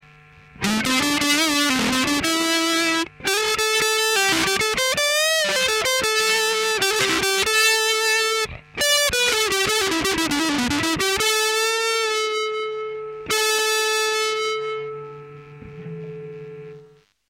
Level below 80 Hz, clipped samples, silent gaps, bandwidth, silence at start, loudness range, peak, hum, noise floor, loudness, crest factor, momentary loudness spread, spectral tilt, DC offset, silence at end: -50 dBFS; under 0.1%; none; 17 kHz; 0.55 s; 5 LU; -6 dBFS; none; -51 dBFS; -19 LUFS; 16 dB; 13 LU; -1.5 dB/octave; under 0.1%; 0.45 s